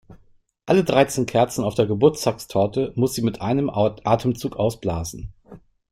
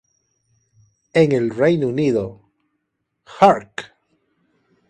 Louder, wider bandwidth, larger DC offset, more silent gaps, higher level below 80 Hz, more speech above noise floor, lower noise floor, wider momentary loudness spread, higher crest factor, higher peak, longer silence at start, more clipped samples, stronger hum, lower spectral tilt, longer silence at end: second, -21 LUFS vs -17 LUFS; first, 16 kHz vs 10 kHz; neither; neither; first, -48 dBFS vs -58 dBFS; second, 36 dB vs 58 dB; second, -56 dBFS vs -75 dBFS; second, 9 LU vs 16 LU; about the same, 20 dB vs 20 dB; about the same, -2 dBFS vs 0 dBFS; second, 0.1 s vs 1.15 s; neither; neither; about the same, -6 dB/octave vs -7 dB/octave; second, 0.35 s vs 1.05 s